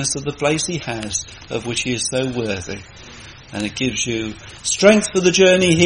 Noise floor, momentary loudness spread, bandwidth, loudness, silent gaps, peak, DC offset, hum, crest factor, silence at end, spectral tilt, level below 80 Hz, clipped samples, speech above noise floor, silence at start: -39 dBFS; 19 LU; 10.5 kHz; -18 LUFS; none; 0 dBFS; under 0.1%; none; 18 dB; 0 s; -3.5 dB/octave; -46 dBFS; under 0.1%; 21 dB; 0 s